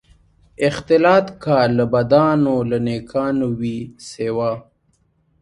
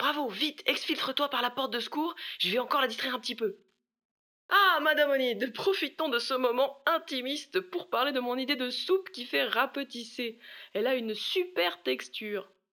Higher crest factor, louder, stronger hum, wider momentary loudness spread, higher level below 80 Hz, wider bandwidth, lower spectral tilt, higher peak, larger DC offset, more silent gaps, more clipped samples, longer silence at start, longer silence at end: about the same, 18 dB vs 20 dB; first, -18 LUFS vs -30 LUFS; neither; about the same, 11 LU vs 10 LU; first, -50 dBFS vs under -90 dBFS; second, 11.5 kHz vs over 20 kHz; first, -7 dB/octave vs -3 dB/octave; first, 0 dBFS vs -10 dBFS; neither; second, none vs 4.05-4.49 s; neither; first, 0.6 s vs 0 s; first, 0.8 s vs 0.3 s